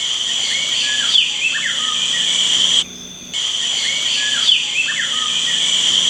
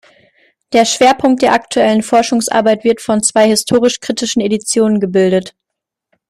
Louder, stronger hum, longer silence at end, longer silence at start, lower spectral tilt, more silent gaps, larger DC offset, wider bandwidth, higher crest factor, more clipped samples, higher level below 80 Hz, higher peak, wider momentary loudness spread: about the same, -14 LUFS vs -12 LUFS; neither; second, 0 s vs 0.8 s; second, 0 s vs 0.7 s; second, 2 dB/octave vs -3.5 dB/octave; neither; neither; first, 17 kHz vs 14 kHz; about the same, 16 dB vs 14 dB; neither; second, -58 dBFS vs -52 dBFS; about the same, -2 dBFS vs 0 dBFS; about the same, 5 LU vs 5 LU